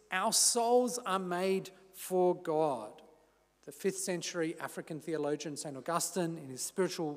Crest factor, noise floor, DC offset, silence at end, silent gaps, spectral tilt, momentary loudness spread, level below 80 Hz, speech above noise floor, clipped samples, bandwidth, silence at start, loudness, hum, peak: 18 dB; -68 dBFS; under 0.1%; 0 s; none; -3 dB/octave; 15 LU; -82 dBFS; 35 dB; under 0.1%; 16 kHz; 0.1 s; -33 LUFS; none; -16 dBFS